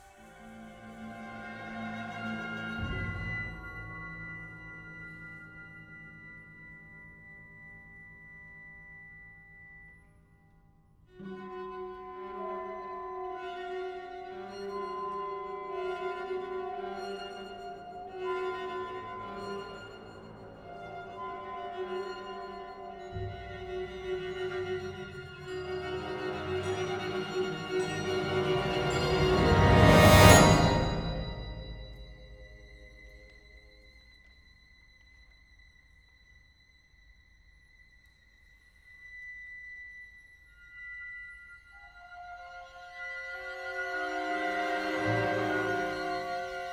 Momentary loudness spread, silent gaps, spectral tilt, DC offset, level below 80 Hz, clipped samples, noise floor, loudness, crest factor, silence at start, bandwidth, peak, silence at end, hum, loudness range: 20 LU; none; -5 dB/octave; under 0.1%; -46 dBFS; under 0.1%; -62 dBFS; -30 LUFS; 30 dB; 0 s; over 20 kHz; -2 dBFS; 0 s; none; 26 LU